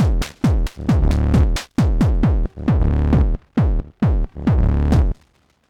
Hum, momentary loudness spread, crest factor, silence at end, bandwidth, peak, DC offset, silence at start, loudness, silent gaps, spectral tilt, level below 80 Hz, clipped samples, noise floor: none; 4 LU; 12 dB; 0.55 s; 12 kHz; -4 dBFS; under 0.1%; 0 s; -19 LUFS; none; -8 dB/octave; -20 dBFS; under 0.1%; -58 dBFS